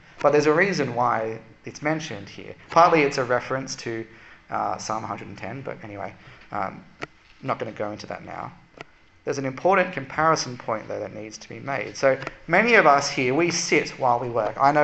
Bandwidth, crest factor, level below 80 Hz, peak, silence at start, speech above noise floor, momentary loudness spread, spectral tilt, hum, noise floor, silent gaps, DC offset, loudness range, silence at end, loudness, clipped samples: 8.4 kHz; 22 dB; -58 dBFS; -2 dBFS; 0.15 s; 23 dB; 18 LU; -4.5 dB/octave; none; -47 dBFS; none; under 0.1%; 12 LU; 0 s; -23 LUFS; under 0.1%